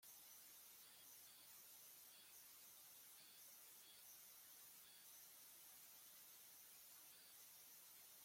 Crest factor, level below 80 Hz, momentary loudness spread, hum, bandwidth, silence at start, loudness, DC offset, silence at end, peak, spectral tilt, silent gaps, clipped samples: 14 dB; under -90 dBFS; 1 LU; none; 16.5 kHz; 0 s; -62 LUFS; under 0.1%; 0 s; -50 dBFS; 1 dB/octave; none; under 0.1%